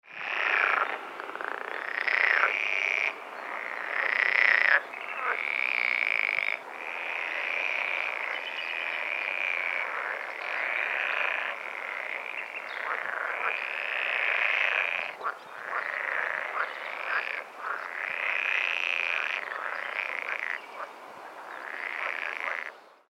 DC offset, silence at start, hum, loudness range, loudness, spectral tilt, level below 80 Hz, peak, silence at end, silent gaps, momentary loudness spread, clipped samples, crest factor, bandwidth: under 0.1%; 0.05 s; none; 6 LU; -28 LUFS; -0.5 dB/octave; under -90 dBFS; -6 dBFS; 0.15 s; none; 11 LU; under 0.1%; 24 dB; 16 kHz